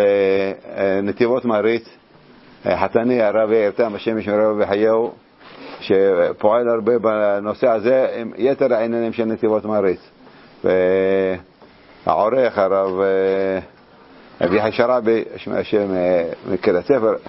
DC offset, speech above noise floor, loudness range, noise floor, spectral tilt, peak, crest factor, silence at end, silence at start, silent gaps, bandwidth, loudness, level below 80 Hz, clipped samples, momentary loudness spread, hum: under 0.1%; 30 dB; 2 LU; -47 dBFS; -10.5 dB/octave; 0 dBFS; 18 dB; 0 s; 0 s; none; 5.8 kHz; -18 LUFS; -58 dBFS; under 0.1%; 7 LU; none